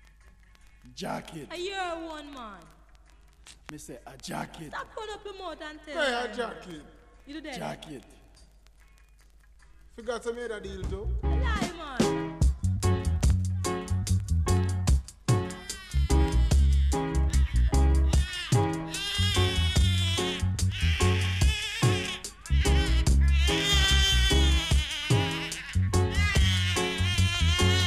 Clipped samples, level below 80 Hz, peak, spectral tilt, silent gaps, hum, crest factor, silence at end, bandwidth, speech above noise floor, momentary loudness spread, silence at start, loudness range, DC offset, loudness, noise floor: under 0.1%; -30 dBFS; -10 dBFS; -4.5 dB/octave; none; none; 16 dB; 0 s; 14.5 kHz; 22 dB; 16 LU; 0.85 s; 16 LU; under 0.1%; -27 LUFS; -56 dBFS